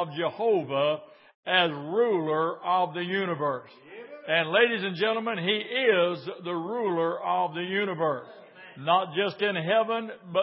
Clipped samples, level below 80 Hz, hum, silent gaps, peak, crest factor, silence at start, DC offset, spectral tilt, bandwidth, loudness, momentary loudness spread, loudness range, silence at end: under 0.1%; -84 dBFS; none; 1.35-1.43 s; -8 dBFS; 20 dB; 0 s; under 0.1%; -9 dB/octave; 5.8 kHz; -27 LUFS; 11 LU; 2 LU; 0 s